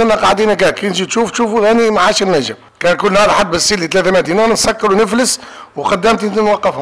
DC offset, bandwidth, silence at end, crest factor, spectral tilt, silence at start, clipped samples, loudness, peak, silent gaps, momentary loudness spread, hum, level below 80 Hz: 1%; 11 kHz; 0 s; 6 dB; -3.5 dB/octave; 0 s; under 0.1%; -12 LUFS; -6 dBFS; none; 6 LU; none; -40 dBFS